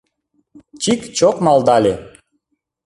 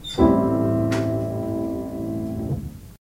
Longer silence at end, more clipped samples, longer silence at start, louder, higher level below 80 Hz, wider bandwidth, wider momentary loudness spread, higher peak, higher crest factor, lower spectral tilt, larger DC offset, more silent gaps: first, 0.8 s vs 0.1 s; neither; first, 0.75 s vs 0 s; first, -15 LUFS vs -23 LUFS; second, -52 dBFS vs -38 dBFS; second, 11.5 kHz vs 16 kHz; about the same, 9 LU vs 11 LU; first, -2 dBFS vs -6 dBFS; about the same, 16 dB vs 18 dB; second, -4.5 dB/octave vs -7.5 dB/octave; neither; neither